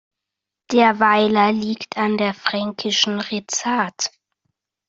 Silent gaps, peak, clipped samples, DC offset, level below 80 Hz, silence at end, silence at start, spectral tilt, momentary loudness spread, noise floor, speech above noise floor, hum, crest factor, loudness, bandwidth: none; -2 dBFS; under 0.1%; under 0.1%; -64 dBFS; 0.8 s; 0.7 s; -3 dB/octave; 9 LU; -84 dBFS; 65 dB; none; 18 dB; -19 LUFS; 7.8 kHz